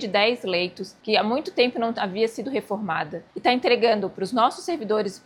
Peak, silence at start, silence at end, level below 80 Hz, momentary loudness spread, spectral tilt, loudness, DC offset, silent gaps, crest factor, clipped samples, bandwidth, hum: -4 dBFS; 0 s; 0.1 s; -68 dBFS; 9 LU; -4.5 dB/octave; -24 LUFS; under 0.1%; none; 20 dB; under 0.1%; 12.5 kHz; none